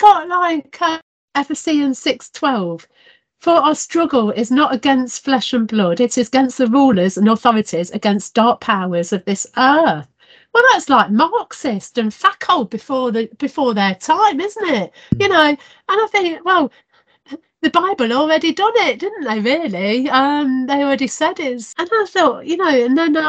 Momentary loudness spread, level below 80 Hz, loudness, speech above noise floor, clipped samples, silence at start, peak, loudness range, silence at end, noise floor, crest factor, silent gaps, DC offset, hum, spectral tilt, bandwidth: 9 LU; -56 dBFS; -16 LUFS; 23 dB; under 0.1%; 0 s; 0 dBFS; 2 LU; 0 s; -39 dBFS; 16 dB; 1.02-1.28 s; under 0.1%; none; -4.5 dB/octave; 9.2 kHz